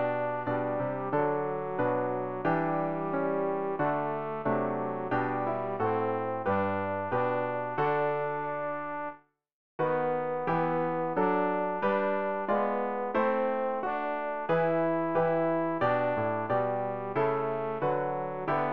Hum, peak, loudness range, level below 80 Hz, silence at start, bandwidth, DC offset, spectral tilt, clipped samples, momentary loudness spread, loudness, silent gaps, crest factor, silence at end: none; -14 dBFS; 3 LU; -66 dBFS; 0 s; 5.4 kHz; 0.3%; -9.5 dB/octave; under 0.1%; 5 LU; -30 LUFS; 9.53-9.79 s; 14 dB; 0 s